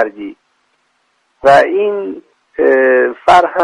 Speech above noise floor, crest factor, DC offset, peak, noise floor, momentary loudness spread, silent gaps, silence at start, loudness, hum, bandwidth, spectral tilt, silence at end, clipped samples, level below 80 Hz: 50 dB; 12 dB; under 0.1%; 0 dBFS; -61 dBFS; 20 LU; none; 0 s; -11 LUFS; none; 11 kHz; -5 dB/octave; 0 s; under 0.1%; -50 dBFS